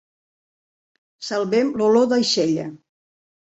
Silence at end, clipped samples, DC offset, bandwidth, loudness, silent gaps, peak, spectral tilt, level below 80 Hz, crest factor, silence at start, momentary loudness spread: 0.75 s; under 0.1%; under 0.1%; 8.2 kHz; -19 LUFS; none; -6 dBFS; -4.5 dB/octave; -66 dBFS; 16 dB; 1.2 s; 13 LU